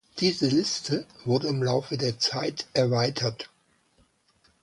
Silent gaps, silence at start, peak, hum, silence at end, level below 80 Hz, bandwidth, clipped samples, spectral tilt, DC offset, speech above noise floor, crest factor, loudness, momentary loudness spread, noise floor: none; 0.15 s; -10 dBFS; none; 1.15 s; -64 dBFS; 11.5 kHz; under 0.1%; -5 dB/octave; under 0.1%; 39 dB; 18 dB; -26 LUFS; 7 LU; -66 dBFS